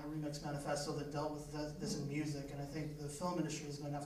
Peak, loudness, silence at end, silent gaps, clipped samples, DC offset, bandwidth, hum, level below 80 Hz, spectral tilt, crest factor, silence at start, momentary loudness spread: -26 dBFS; -43 LUFS; 0 s; none; under 0.1%; under 0.1%; 15.5 kHz; none; -60 dBFS; -5.5 dB/octave; 16 dB; 0 s; 5 LU